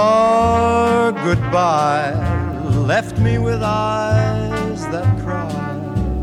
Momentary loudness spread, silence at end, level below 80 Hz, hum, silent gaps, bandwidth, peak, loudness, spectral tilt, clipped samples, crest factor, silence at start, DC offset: 8 LU; 0 s; -32 dBFS; none; none; 11.5 kHz; -4 dBFS; -17 LUFS; -7 dB/octave; under 0.1%; 12 dB; 0 s; under 0.1%